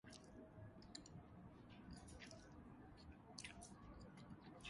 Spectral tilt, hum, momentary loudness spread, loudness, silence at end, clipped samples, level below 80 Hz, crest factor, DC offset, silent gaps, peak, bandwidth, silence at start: -4 dB/octave; none; 6 LU; -60 LUFS; 0 s; under 0.1%; -70 dBFS; 26 dB; under 0.1%; none; -34 dBFS; 11 kHz; 0.05 s